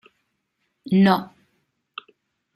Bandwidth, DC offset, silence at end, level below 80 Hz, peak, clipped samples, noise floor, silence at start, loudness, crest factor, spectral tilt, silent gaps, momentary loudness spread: 13 kHz; under 0.1%; 1.3 s; -66 dBFS; -2 dBFS; under 0.1%; -74 dBFS; 0.85 s; -19 LUFS; 22 dB; -8 dB/octave; none; 23 LU